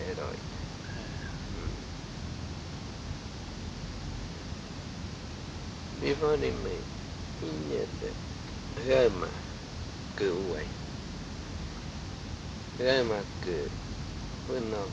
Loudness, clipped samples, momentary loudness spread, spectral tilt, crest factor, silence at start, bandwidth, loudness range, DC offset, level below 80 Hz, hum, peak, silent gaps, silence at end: -35 LUFS; under 0.1%; 12 LU; -5.5 dB/octave; 22 dB; 0 s; 10.5 kHz; 8 LU; under 0.1%; -46 dBFS; none; -12 dBFS; none; 0 s